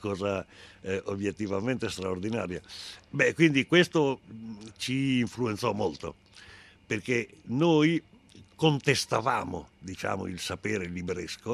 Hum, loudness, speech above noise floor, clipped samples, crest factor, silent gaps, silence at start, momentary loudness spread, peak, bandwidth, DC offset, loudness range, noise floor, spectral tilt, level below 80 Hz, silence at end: none; -29 LUFS; 25 dB; under 0.1%; 22 dB; none; 0 s; 17 LU; -8 dBFS; 14 kHz; under 0.1%; 5 LU; -54 dBFS; -5 dB/octave; -64 dBFS; 0 s